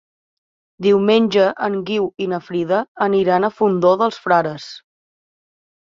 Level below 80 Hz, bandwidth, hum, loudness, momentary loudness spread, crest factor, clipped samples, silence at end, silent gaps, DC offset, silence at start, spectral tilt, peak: -62 dBFS; 7.4 kHz; none; -17 LUFS; 9 LU; 16 dB; under 0.1%; 1.15 s; 2.88-2.95 s; under 0.1%; 0.8 s; -6.5 dB/octave; -2 dBFS